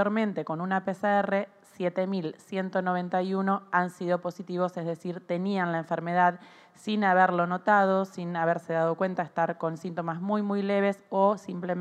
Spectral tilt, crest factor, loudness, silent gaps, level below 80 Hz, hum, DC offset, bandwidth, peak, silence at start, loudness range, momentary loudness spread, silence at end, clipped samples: -7.5 dB/octave; 20 dB; -28 LUFS; none; -82 dBFS; none; under 0.1%; 9.8 kHz; -8 dBFS; 0 s; 4 LU; 10 LU; 0 s; under 0.1%